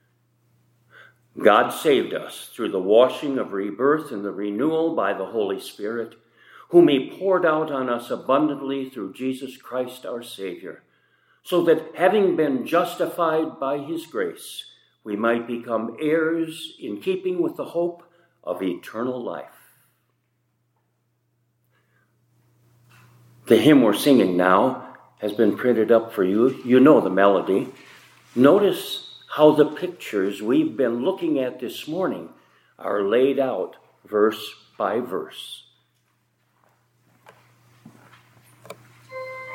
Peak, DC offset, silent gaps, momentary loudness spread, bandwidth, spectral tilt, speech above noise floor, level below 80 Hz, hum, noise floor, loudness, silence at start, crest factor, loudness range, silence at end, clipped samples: -2 dBFS; under 0.1%; none; 17 LU; 16.5 kHz; -6 dB/octave; 49 dB; -76 dBFS; none; -70 dBFS; -22 LUFS; 1.35 s; 22 dB; 11 LU; 0 s; under 0.1%